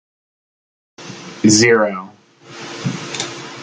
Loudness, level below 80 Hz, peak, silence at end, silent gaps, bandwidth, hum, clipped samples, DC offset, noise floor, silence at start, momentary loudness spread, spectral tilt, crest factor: -16 LUFS; -58 dBFS; 0 dBFS; 0 s; none; 9.6 kHz; none; under 0.1%; under 0.1%; -41 dBFS; 1 s; 23 LU; -3.5 dB/octave; 20 dB